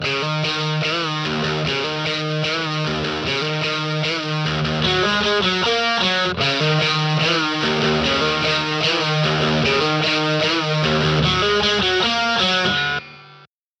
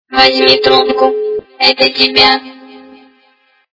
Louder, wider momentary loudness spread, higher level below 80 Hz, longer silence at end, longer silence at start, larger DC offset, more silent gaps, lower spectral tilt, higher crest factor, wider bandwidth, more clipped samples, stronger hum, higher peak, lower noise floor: second, -18 LUFS vs -9 LUFS; second, 5 LU vs 8 LU; about the same, -44 dBFS vs -46 dBFS; second, 0.35 s vs 0.95 s; about the same, 0 s vs 0.1 s; neither; neither; about the same, -4.5 dB/octave vs -3.5 dB/octave; about the same, 14 dB vs 12 dB; first, 8.6 kHz vs 6 kHz; second, under 0.1% vs 0.6%; neither; second, -6 dBFS vs 0 dBFS; second, -49 dBFS vs -53 dBFS